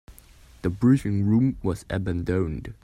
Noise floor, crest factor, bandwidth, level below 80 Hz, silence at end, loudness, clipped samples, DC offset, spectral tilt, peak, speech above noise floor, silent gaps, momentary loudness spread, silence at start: -51 dBFS; 16 dB; 14 kHz; -44 dBFS; 0.1 s; -24 LUFS; under 0.1%; under 0.1%; -8.5 dB/octave; -8 dBFS; 27 dB; none; 10 LU; 0.1 s